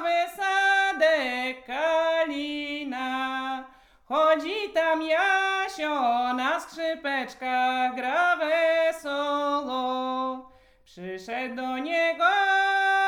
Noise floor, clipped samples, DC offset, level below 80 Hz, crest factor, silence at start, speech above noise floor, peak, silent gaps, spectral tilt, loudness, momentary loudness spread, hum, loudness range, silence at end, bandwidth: -56 dBFS; under 0.1%; under 0.1%; -66 dBFS; 16 dB; 0 s; 31 dB; -10 dBFS; none; -2.5 dB/octave; -25 LUFS; 9 LU; none; 3 LU; 0 s; 16.5 kHz